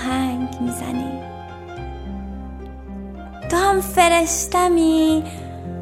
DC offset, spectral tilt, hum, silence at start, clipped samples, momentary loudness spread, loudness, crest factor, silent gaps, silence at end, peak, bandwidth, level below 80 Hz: under 0.1%; -4 dB/octave; none; 0 s; under 0.1%; 19 LU; -18 LUFS; 20 dB; none; 0 s; -2 dBFS; 16 kHz; -38 dBFS